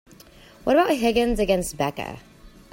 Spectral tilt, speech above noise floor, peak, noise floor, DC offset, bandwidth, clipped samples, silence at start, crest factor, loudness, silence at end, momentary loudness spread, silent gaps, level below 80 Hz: -4.5 dB/octave; 27 dB; -8 dBFS; -49 dBFS; under 0.1%; 16.5 kHz; under 0.1%; 0.65 s; 16 dB; -22 LUFS; 0.25 s; 15 LU; none; -42 dBFS